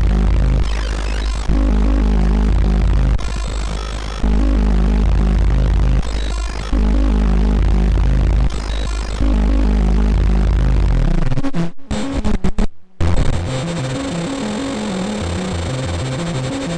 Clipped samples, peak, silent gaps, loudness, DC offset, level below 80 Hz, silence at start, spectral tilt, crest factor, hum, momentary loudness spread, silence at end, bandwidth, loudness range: under 0.1%; -4 dBFS; none; -19 LUFS; under 0.1%; -16 dBFS; 0 s; -6.5 dB/octave; 12 dB; none; 6 LU; 0 s; 9.8 kHz; 4 LU